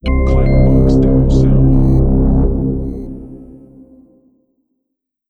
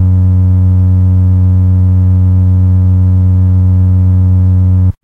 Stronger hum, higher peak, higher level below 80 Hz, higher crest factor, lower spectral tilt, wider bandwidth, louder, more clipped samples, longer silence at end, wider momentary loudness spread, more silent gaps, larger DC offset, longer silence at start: neither; about the same, -2 dBFS vs -2 dBFS; first, -16 dBFS vs -26 dBFS; first, 12 dB vs 4 dB; second, -10 dB/octave vs -12 dB/octave; first, 6.8 kHz vs 1.5 kHz; second, -13 LUFS vs -9 LUFS; neither; first, 1.85 s vs 0.1 s; first, 16 LU vs 0 LU; neither; neither; about the same, 0.05 s vs 0 s